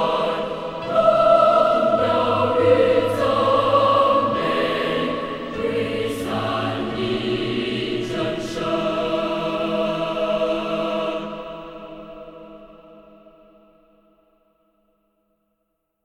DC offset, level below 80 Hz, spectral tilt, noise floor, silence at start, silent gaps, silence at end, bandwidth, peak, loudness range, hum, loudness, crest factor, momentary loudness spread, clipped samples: under 0.1%; -50 dBFS; -6 dB/octave; -74 dBFS; 0 s; none; 3.05 s; 13.5 kHz; -4 dBFS; 11 LU; none; -20 LUFS; 18 dB; 13 LU; under 0.1%